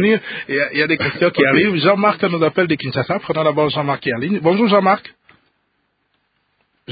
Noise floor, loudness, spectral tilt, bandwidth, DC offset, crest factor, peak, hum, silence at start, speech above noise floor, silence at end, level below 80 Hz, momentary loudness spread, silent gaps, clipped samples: -67 dBFS; -16 LUFS; -11 dB/octave; 5 kHz; under 0.1%; 18 dB; 0 dBFS; 50 Hz at -50 dBFS; 0 s; 51 dB; 0 s; -56 dBFS; 7 LU; none; under 0.1%